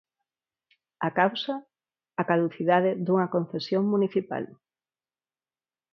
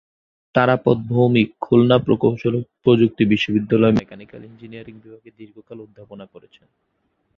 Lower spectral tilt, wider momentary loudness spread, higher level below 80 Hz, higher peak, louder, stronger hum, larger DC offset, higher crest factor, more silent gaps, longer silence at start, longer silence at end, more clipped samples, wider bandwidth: about the same, -8 dB/octave vs -8.5 dB/octave; second, 11 LU vs 23 LU; second, -76 dBFS vs -52 dBFS; second, -8 dBFS vs -2 dBFS; second, -26 LUFS vs -17 LUFS; neither; neither; about the same, 22 dB vs 18 dB; neither; first, 1 s vs 0.55 s; first, 1.4 s vs 1.1 s; neither; about the same, 6.6 kHz vs 6.8 kHz